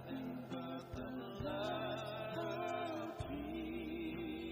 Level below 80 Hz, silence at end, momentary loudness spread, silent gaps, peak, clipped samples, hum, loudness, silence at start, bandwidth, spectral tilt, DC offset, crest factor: -62 dBFS; 0 s; 5 LU; none; -30 dBFS; under 0.1%; none; -44 LUFS; 0 s; 15.5 kHz; -6.5 dB/octave; under 0.1%; 14 dB